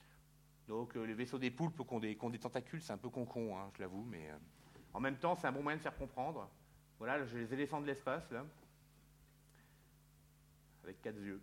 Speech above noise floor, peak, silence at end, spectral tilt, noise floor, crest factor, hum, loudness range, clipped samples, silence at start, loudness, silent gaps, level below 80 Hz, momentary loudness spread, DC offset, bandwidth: 24 dB; -22 dBFS; 0 s; -6.5 dB/octave; -67 dBFS; 22 dB; none; 5 LU; under 0.1%; 0 s; -43 LUFS; none; -68 dBFS; 14 LU; under 0.1%; 16.5 kHz